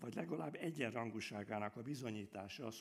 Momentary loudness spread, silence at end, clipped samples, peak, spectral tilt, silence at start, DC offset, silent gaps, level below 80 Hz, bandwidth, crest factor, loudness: 6 LU; 0 s; under 0.1%; -24 dBFS; -5.5 dB/octave; 0 s; under 0.1%; none; -84 dBFS; 15.5 kHz; 20 dB; -46 LUFS